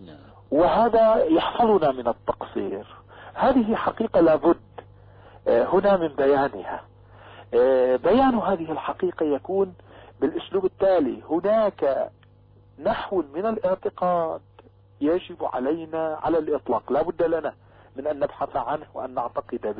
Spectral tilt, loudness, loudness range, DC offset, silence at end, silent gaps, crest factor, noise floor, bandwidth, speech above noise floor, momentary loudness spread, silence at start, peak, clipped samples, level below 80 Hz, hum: -10 dB/octave; -23 LUFS; 5 LU; under 0.1%; 0 s; none; 14 dB; -53 dBFS; 5 kHz; 31 dB; 11 LU; 0 s; -10 dBFS; under 0.1%; -52 dBFS; none